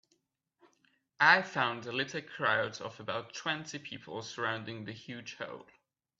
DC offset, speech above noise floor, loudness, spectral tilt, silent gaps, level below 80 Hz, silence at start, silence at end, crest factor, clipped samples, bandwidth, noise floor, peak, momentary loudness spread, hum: under 0.1%; 44 dB; -32 LUFS; -3.5 dB/octave; none; -78 dBFS; 1.2 s; 0.6 s; 26 dB; under 0.1%; 7.8 kHz; -78 dBFS; -8 dBFS; 18 LU; none